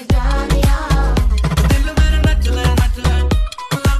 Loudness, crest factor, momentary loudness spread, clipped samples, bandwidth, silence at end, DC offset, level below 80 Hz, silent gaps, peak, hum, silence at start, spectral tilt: -16 LUFS; 10 dB; 3 LU; under 0.1%; 14 kHz; 0 s; under 0.1%; -14 dBFS; none; -4 dBFS; none; 0 s; -5.5 dB/octave